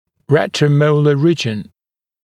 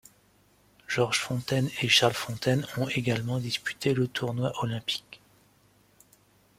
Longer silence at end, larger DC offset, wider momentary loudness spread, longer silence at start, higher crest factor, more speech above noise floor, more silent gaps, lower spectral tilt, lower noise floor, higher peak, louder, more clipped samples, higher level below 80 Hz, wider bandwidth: second, 0.6 s vs 1.4 s; neither; about the same, 8 LU vs 10 LU; second, 0.3 s vs 0.9 s; second, 16 dB vs 22 dB; first, over 76 dB vs 35 dB; neither; first, -6.5 dB/octave vs -4.5 dB/octave; first, under -90 dBFS vs -63 dBFS; first, 0 dBFS vs -8 dBFS; first, -14 LUFS vs -28 LUFS; neither; about the same, -60 dBFS vs -62 dBFS; second, 10 kHz vs 16 kHz